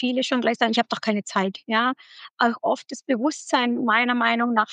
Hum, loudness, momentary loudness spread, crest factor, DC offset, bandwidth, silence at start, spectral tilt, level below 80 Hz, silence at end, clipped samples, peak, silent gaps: none; -23 LUFS; 6 LU; 18 dB; under 0.1%; 9.4 kHz; 0 s; -4 dB/octave; -88 dBFS; 0 s; under 0.1%; -4 dBFS; 2.33-2.37 s